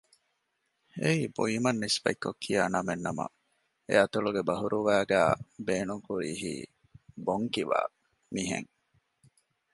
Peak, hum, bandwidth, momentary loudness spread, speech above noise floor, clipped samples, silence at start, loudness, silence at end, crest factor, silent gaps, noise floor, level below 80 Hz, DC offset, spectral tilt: -10 dBFS; none; 11.5 kHz; 12 LU; 49 dB; under 0.1%; 0.95 s; -30 LUFS; 1.1 s; 22 dB; none; -78 dBFS; -64 dBFS; under 0.1%; -4.5 dB/octave